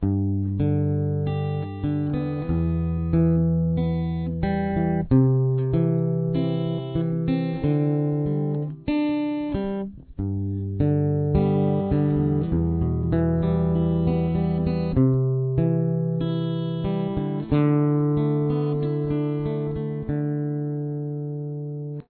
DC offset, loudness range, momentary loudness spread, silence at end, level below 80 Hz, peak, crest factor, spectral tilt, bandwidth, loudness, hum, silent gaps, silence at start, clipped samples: under 0.1%; 3 LU; 7 LU; 0.1 s; -40 dBFS; -8 dBFS; 14 dB; -13 dB/octave; 4.5 kHz; -24 LUFS; none; none; 0 s; under 0.1%